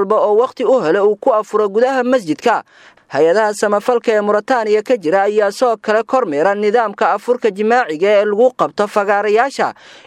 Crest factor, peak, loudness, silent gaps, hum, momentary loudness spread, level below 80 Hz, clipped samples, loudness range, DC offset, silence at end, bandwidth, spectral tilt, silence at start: 14 dB; 0 dBFS; -15 LUFS; none; none; 4 LU; -68 dBFS; under 0.1%; 1 LU; under 0.1%; 0.35 s; 13 kHz; -4.5 dB/octave; 0 s